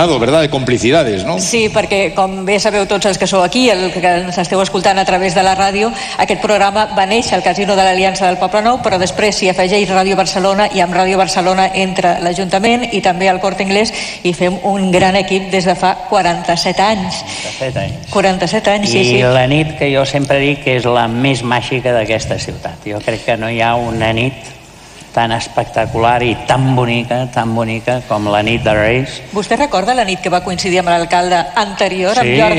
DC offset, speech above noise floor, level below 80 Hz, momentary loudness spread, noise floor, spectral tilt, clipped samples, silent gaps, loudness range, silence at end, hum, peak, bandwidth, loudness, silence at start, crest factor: under 0.1%; 23 dB; -38 dBFS; 6 LU; -36 dBFS; -4.5 dB/octave; under 0.1%; none; 3 LU; 0 s; none; 0 dBFS; 15 kHz; -13 LUFS; 0 s; 12 dB